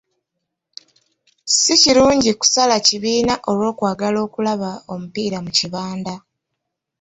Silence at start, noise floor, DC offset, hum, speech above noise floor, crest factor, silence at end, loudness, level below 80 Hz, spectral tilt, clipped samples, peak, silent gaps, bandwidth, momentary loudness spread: 1.45 s; -78 dBFS; under 0.1%; none; 61 dB; 18 dB; 0.8 s; -16 LUFS; -50 dBFS; -2.5 dB/octave; under 0.1%; -2 dBFS; none; 8.4 kHz; 17 LU